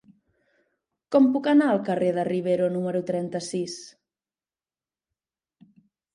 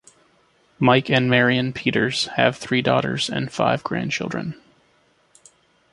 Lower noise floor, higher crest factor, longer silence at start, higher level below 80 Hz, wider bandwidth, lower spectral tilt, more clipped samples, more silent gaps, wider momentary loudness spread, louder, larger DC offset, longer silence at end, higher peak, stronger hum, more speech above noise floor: first, under -90 dBFS vs -61 dBFS; about the same, 18 dB vs 20 dB; first, 1.1 s vs 0.8 s; second, -76 dBFS vs -58 dBFS; about the same, 11 kHz vs 11.5 kHz; first, -6.5 dB/octave vs -5 dB/octave; neither; neither; about the same, 10 LU vs 8 LU; second, -24 LUFS vs -20 LUFS; neither; first, 2.25 s vs 1.4 s; second, -8 dBFS vs -2 dBFS; neither; first, over 67 dB vs 40 dB